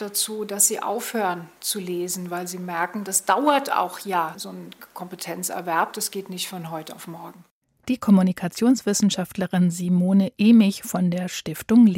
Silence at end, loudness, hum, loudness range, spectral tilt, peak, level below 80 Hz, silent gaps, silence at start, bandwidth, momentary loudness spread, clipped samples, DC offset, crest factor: 0 s; -22 LUFS; none; 9 LU; -4.5 dB/octave; -4 dBFS; -64 dBFS; 7.51-7.61 s; 0 s; 16.5 kHz; 17 LU; under 0.1%; under 0.1%; 18 dB